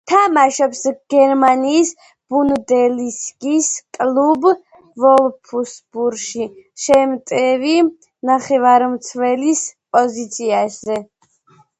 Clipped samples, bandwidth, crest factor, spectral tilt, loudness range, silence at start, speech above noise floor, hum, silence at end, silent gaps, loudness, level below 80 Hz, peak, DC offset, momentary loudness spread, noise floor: under 0.1%; 11 kHz; 16 dB; -3 dB/octave; 2 LU; 0.05 s; 38 dB; none; 0.75 s; none; -16 LUFS; -60 dBFS; 0 dBFS; under 0.1%; 12 LU; -53 dBFS